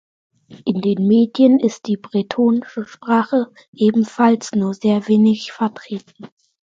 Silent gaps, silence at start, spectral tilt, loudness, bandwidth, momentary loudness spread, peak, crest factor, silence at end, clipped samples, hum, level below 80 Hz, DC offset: 3.68-3.73 s; 0.5 s; -7 dB/octave; -17 LUFS; 7.6 kHz; 14 LU; -2 dBFS; 16 dB; 0.5 s; under 0.1%; none; -64 dBFS; under 0.1%